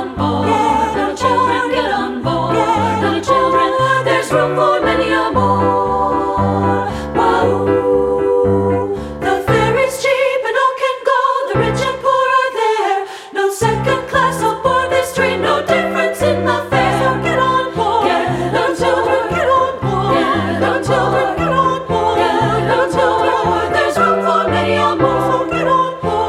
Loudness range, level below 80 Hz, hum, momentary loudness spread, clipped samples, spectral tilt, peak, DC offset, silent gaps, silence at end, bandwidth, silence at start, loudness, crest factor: 1 LU; -38 dBFS; none; 3 LU; under 0.1%; -5.5 dB/octave; -2 dBFS; under 0.1%; none; 0 s; 15.5 kHz; 0 s; -15 LUFS; 14 dB